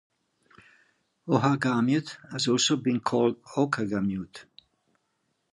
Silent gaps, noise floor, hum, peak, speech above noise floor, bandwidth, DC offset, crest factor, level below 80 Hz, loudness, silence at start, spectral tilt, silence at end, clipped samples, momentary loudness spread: none; -76 dBFS; none; -10 dBFS; 50 dB; 11.5 kHz; under 0.1%; 18 dB; -64 dBFS; -26 LUFS; 1.25 s; -4.5 dB/octave; 1.1 s; under 0.1%; 13 LU